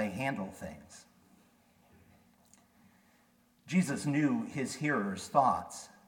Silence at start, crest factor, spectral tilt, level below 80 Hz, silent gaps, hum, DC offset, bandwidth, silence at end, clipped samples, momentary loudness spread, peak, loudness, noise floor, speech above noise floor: 0 s; 24 dB; -5.5 dB/octave; -70 dBFS; none; none; under 0.1%; 17.5 kHz; 0.2 s; under 0.1%; 18 LU; -12 dBFS; -32 LUFS; -68 dBFS; 36 dB